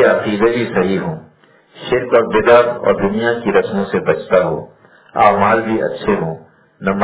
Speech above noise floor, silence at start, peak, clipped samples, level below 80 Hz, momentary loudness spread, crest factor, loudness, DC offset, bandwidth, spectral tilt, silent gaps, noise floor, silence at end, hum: 29 dB; 0 s; 0 dBFS; 0.1%; -48 dBFS; 14 LU; 16 dB; -15 LUFS; under 0.1%; 4 kHz; -10 dB/octave; none; -43 dBFS; 0 s; none